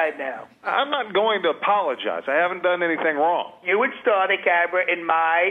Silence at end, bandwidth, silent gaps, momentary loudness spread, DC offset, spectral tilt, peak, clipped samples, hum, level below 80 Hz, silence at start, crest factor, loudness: 0 s; 4.6 kHz; none; 6 LU; under 0.1%; -5.5 dB/octave; -6 dBFS; under 0.1%; none; -76 dBFS; 0 s; 16 dB; -21 LUFS